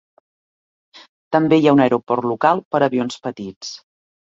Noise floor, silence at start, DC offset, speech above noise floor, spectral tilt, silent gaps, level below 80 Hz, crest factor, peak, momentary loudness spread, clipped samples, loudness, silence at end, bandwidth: under -90 dBFS; 1.3 s; under 0.1%; over 73 dB; -6.5 dB/octave; 2.65-2.71 s, 3.56-3.61 s; -62 dBFS; 18 dB; -2 dBFS; 17 LU; under 0.1%; -17 LUFS; 0.55 s; 7.8 kHz